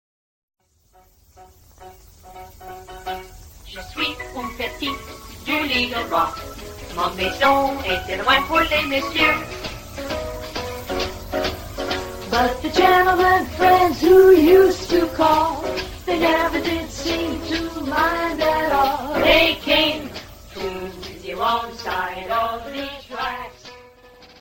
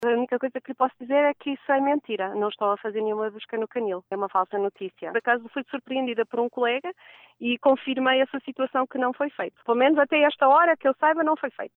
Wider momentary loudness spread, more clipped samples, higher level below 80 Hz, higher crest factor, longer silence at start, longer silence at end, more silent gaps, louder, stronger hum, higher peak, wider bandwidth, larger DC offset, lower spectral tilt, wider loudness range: first, 18 LU vs 11 LU; neither; first, -40 dBFS vs -82 dBFS; about the same, 18 dB vs 16 dB; first, 1.4 s vs 0 s; about the same, 0.15 s vs 0.1 s; neither; first, -19 LUFS vs -24 LUFS; neither; first, -2 dBFS vs -8 dBFS; first, 17 kHz vs 4.1 kHz; neither; second, -4 dB/octave vs -6.5 dB/octave; first, 14 LU vs 6 LU